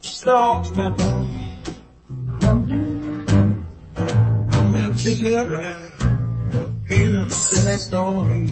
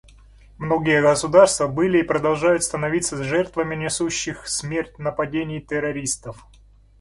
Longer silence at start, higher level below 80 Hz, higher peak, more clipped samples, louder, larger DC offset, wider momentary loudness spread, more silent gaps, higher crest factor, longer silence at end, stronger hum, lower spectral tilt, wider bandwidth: second, 0.05 s vs 0.6 s; first, -34 dBFS vs -48 dBFS; about the same, -4 dBFS vs -2 dBFS; neither; about the same, -20 LUFS vs -21 LUFS; neither; about the same, 12 LU vs 11 LU; neither; about the same, 16 dB vs 20 dB; second, 0 s vs 0.65 s; neither; first, -5.5 dB/octave vs -4 dB/octave; second, 8.8 kHz vs 11.5 kHz